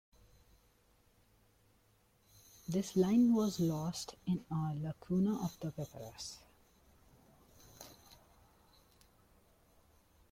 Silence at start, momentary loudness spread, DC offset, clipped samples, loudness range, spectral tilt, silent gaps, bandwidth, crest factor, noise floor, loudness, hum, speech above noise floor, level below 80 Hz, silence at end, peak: 2.7 s; 24 LU; under 0.1%; under 0.1%; 16 LU; -6.5 dB/octave; none; 16.5 kHz; 20 dB; -71 dBFS; -36 LUFS; none; 36 dB; -68 dBFS; 2.4 s; -20 dBFS